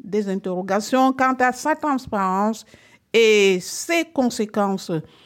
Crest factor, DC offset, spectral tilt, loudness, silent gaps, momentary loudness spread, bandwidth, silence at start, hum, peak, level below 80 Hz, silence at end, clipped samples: 16 dB; under 0.1%; -4 dB/octave; -20 LUFS; none; 9 LU; 17 kHz; 0.05 s; none; -6 dBFS; -60 dBFS; 0.2 s; under 0.1%